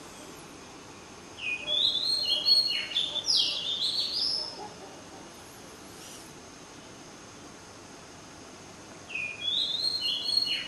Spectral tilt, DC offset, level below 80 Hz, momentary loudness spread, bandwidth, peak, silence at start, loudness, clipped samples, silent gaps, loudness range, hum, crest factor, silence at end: -0.5 dB/octave; under 0.1%; -64 dBFS; 22 LU; 13 kHz; -12 dBFS; 0 s; -26 LUFS; under 0.1%; none; 21 LU; none; 20 dB; 0 s